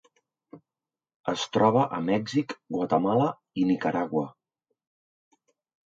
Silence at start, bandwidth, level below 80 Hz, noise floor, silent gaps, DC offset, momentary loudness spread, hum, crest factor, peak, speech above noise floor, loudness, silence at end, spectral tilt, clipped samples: 0.55 s; 7.8 kHz; -68 dBFS; under -90 dBFS; 1.16-1.24 s; under 0.1%; 10 LU; none; 22 dB; -8 dBFS; over 65 dB; -26 LUFS; 1.55 s; -6.5 dB/octave; under 0.1%